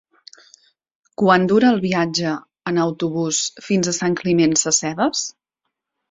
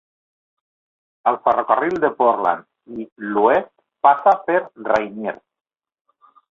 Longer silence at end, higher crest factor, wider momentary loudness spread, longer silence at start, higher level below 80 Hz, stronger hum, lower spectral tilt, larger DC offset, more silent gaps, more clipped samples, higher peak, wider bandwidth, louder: second, 0.8 s vs 1.15 s; about the same, 18 dB vs 18 dB; second, 9 LU vs 16 LU; about the same, 1.2 s vs 1.25 s; about the same, -60 dBFS vs -62 dBFS; neither; second, -4 dB/octave vs -7 dB/octave; neither; second, none vs 3.12-3.16 s; neither; about the same, -2 dBFS vs -2 dBFS; about the same, 8 kHz vs 7.4 kHz; about the same, -18 LUFS vs -19 LUFS